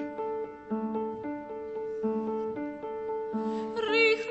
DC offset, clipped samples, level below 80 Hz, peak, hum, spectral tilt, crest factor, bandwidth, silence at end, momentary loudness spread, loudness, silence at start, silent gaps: under 0.1%; under 0.1%; -68 dBFS; -12 dBFS; none; -5.5 dB/octave; 20 dB; 8.2 kHz; 0 s; 13 LU; -32 LUFS; 0 s; none